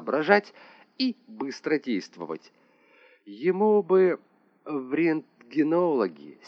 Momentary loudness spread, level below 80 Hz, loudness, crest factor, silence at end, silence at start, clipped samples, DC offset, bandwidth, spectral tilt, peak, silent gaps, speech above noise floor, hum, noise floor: 14 LU; under -90 dBFS; -26 LUFS; 22 dB; 0.15 s; 0 s; under 0.1%; under 0.1%; 6.8 kHz; -6.5 dB/octave; -4 dBFS; none; 33 dB; none; -59 dBFS